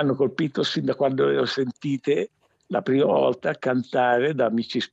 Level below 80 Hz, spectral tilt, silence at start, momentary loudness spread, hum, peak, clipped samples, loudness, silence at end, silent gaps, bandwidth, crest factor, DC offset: -72 dBFS; -6.5 dB/octave; 0 s; 6 LU; none; -8 dBFS; under 0.1%; -23 LUFS; 0.05 s; none; 8 kHz; 14 dB; under 0.1%